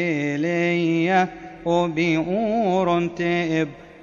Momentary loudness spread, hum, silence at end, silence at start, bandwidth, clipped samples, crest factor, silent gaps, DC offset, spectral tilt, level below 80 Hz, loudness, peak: 4 LU; none; 0 s; 0 s; 7.4 kHz; under 0.1%; 14 dB; none; under 0.1%; -6.5 dB/octave; -56 dBFS; -22 LUFS; -8 dBFS